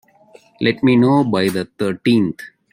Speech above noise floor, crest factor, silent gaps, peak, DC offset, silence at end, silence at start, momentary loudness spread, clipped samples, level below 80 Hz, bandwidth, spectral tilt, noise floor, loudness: 33 dB; 16 dB; none; -2 dBFS; under 0.1%; 0.25 s; 0.6 s; 9 LU; under 0.1%; -58 dBFS; 16.5 kHz; -7 dB/octave; -49 dBFS; -17 LUFS